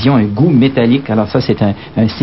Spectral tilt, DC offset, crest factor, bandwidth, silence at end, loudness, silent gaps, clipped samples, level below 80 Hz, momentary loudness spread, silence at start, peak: -10.5 dB/octave; 0.6%; 12 dB; 5.8 kHz; 0 s; -12 LUFS; none; under 0.1%; -42 dBFS; 6 LU; 0 s; 0 dBFS